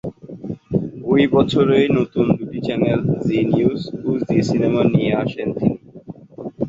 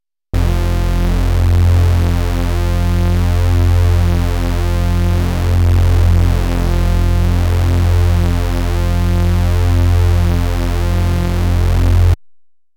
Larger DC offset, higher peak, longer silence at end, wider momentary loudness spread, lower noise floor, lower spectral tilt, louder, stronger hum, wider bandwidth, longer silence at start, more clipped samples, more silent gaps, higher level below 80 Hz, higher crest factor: neither; about the same, -2 dBFS vs -2 dBFS; second, 0 s vs 0.45 s; first, 17 LU vs 5 LU; second, -38 dBFS vs -47 dBFS; about the same, -8 dB/octave vs -7 dB/octave; second, -18 LUFS vs -15 LUFS; neither; second, 7.8 kHz vs 17 kHz; second, 0.05 s vs 0.35 s; neither; neither; second, -48 dBFS vs -16 dBFS; first, 16 dB vs 10 dB